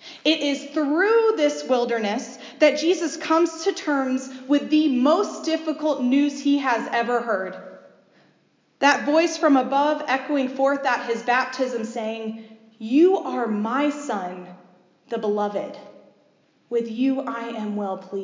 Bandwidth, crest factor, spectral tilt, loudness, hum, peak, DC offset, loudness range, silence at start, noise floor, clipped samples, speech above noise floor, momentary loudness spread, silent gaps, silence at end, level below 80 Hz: 7.6 kHz; 18 dB; -4 dB/octave; -22 LUFS; none; -4 dBFS; under 0.1%; 6 LU; 0.05 s; -63 dBFS; under 0.1%; 41 dB; 11 LU; none; 0 s; -84 dBFS